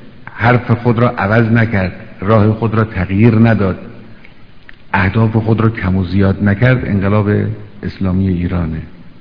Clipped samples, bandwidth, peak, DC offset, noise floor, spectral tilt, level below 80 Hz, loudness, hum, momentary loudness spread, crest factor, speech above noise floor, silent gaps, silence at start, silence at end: 0.3%; 5.4 kHz; 0 dBFS; 1%; -39 dBFS; -10.5 dB/octave; -36 dBFS; -13 LUFS; none; 11 LU; 14 dB; 27 dB; none; 0 s; 0.1 s